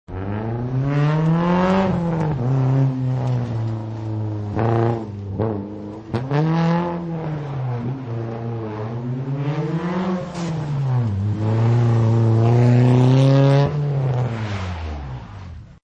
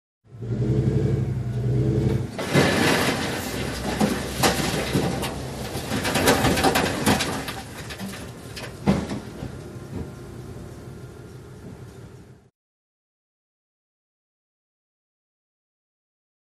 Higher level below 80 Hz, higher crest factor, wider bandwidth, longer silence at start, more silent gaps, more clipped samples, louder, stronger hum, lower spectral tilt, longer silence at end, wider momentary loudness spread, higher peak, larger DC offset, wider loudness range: about the same, -44 dBFS vs -42 dBFS; second, 16 dB vs 22 dB; second, 7.6 kHz vs 15 kHz; second, 0.1 s vs 0.3 s; neither; neither; first, -20 LUFS vs -23 LUFS; neither; first, -9 dB/octave vs -5 dB/octave; second, 0.2 s vs 4.1 s; second, 13 LU vs 21 LU; about the same, -4 dBFS vs -4 dBFS; neither; second, 8 LU vs 18 LU